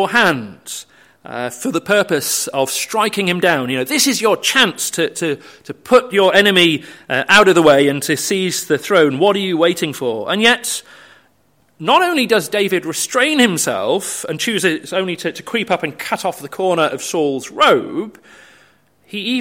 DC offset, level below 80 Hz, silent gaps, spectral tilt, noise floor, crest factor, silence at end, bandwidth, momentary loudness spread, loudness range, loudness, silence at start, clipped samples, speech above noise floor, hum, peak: under 0.1%; -60 dBFS; none; -3 dB/octave; -58 dBFS; 16 dB; 0 s; 16.5 kHz; 13 LU; 6 LU; -15 LUFS; 0 s; under 0.1%; 42 dB; none; 0 dBFS